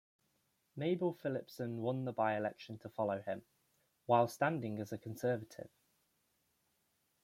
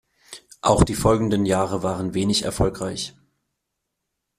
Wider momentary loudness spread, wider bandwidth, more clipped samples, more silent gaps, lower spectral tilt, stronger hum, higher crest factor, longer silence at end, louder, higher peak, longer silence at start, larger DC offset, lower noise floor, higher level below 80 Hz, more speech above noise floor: about the same, 17 LU vs 15 LU; about the same, 16.5 kHz vs 15 kHz; neither; neither; first, -7 dB/octave vs -5.5 dB/octave; neither; about the same, 24 dB vs 20 dB; first, 1.55 s vs 1.3 s; second, -38 LUFS vs -22 LUFS; second, -16 dBFS vs -2 dBFS; first, 0.75 s vs 0.3 s; neither; about the same, -80 dBFS vs -80 dBFS; second, -80 dBFS vs -38 dBFS; second, 42 dB vs 59 dB